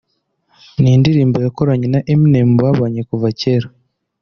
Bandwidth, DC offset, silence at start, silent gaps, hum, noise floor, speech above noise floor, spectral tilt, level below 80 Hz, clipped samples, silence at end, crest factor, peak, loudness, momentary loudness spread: 6.6 kHz; under 0.1%; 0.8 s; none; none; -64 dBFS; 52 dB; -8.5 dB/octave; -46 dBFS; under 0.1%; 0.55 s; 12 dB; -2 dBFS; -14 LUFS; 8 LU